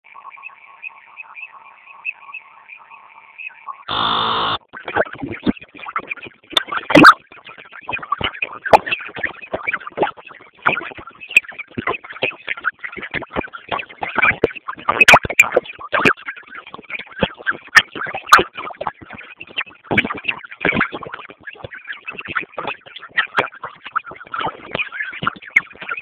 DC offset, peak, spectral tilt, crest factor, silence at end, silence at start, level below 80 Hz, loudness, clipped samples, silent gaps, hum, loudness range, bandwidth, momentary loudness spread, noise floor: under 0.1%; 0 dBFS; -3.5 dB/octave; 20 dB; 0 s; 0.25 s; -48 dBFS; -18 LUFS; 0.3%; none; none; 9 LU; 15.5 kHz; 22 LU; -43 dBFS